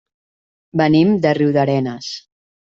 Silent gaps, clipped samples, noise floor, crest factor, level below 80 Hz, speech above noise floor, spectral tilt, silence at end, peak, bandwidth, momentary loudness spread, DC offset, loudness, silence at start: none; under 0.1%; under -90 dBFS; 16 dB; -54 dBFS; over 75 dB; -7 dB/octave; 0.45 s; -2 dBFS; 7.6 kHz; 15 LU; under 0.1%; -16 LUFS; 0.75 s